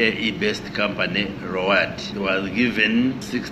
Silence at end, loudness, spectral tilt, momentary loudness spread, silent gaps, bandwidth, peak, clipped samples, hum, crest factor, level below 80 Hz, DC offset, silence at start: 0 s; -21 LUFS; -5 dB/octave; 7 LU; none; 13 kHz; -4 dBFS; under 0.1%; none; 20 dB; -50 dBFS; under 0.1%; 0 s